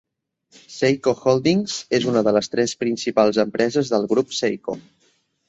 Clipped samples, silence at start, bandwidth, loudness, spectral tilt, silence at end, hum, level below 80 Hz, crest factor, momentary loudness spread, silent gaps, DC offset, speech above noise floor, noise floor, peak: under 0.1%; 0.7 s; 8.2 kHz; -20 LUFS; -5 dB/octave; 0.7 s; none; -60 dBFS; 18 dB; 6 LU; none; under 0.1%; 44 dB; -64 dBFS; -4 dBFS